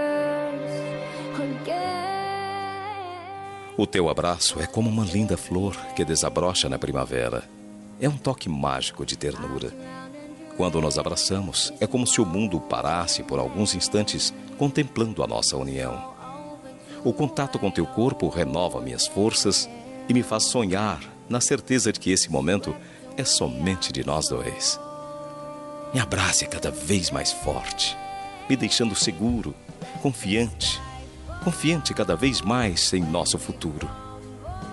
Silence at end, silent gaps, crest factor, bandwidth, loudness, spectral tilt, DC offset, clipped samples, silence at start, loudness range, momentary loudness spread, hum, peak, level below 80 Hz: 0 s; none; 20 dB; 12 kHz; -24 LUFS; -3.5 dB/octave; under 0.1%; under 0.1%; 0 s; 4 LU; 15 LU; none; -6 dBFS; -46 dBFS